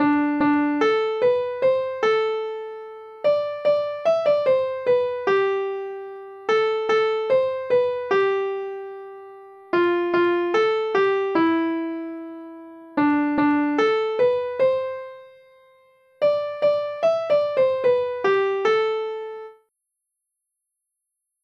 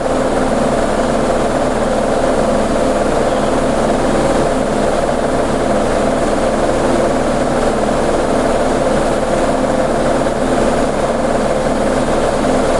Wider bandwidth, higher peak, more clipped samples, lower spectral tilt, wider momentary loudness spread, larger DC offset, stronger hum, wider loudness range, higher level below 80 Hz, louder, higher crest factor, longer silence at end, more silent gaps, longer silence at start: second, 7 kHz vs 11.5 kHz; second, -8 dBFS vs -2 dBFS; neither; about the same, -6 dB/octave vs -5.5 dB/octave; first, 14 LU vs 1 LU; second, under 0.1% vs 0.3%; neither; about the same, 2 LU vs 0 LU; second, -68 dBFS vs -26 dBFS; second, -22 LUFS vs -15 LUFS; about the same, 14 dB vs 10 dB; first, 1.9 s vs 0 s; neither; about the same, 0 s vs 0 s